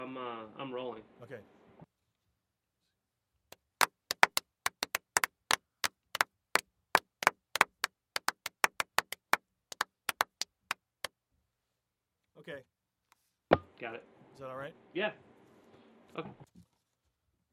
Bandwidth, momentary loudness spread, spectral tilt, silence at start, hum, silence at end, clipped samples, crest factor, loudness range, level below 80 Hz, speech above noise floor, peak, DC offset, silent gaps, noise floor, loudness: 16 kHz; 18 LU; -1.5 dB/octave; 0 s; none; 1.1 s; under 0.1%; 34 dB; 12 LU; -74 dBFS; 44 dB; -4 dBFS; under 0.1%; none; -86 dBFS; -34 LUFS